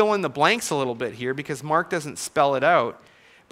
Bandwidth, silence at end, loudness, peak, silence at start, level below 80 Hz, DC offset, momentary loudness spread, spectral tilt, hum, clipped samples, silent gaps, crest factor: 16 kHz; 0.55 s; -23 LUFS; -4 dBFS; 0 s; -66 dBFS; under 0.1%; 9 LU; -4 dB/octave; none; under 0.1%; none; 20 dB